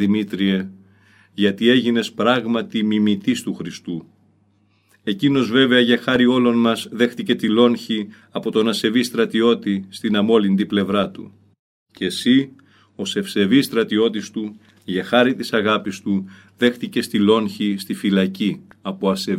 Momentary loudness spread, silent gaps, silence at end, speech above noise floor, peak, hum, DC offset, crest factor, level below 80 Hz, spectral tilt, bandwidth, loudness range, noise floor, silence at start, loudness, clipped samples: 13 LU; 11.59-11.86 s; 0 s; 41 dB; -2 dBFS; none; under 0.1%; 18 dB; -64 dBFS; -5.5 dB/octave; 15.5 kHz; 3 LU; -60 dBFS; 0 s; -19 LUFS; under 0.1%